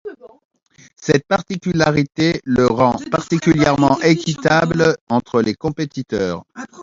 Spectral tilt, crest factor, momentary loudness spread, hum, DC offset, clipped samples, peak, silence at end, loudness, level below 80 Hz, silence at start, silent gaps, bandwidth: -6 dB/octave; 18 dB; 9 LU; none; under 0.1%; under 0.1%; 0 dBFS; 0 s; -17 LUFS; -46 dBFS; 0.05 s; 0.45-0.50 s, 5.01-5.07 s; 7.8 kHz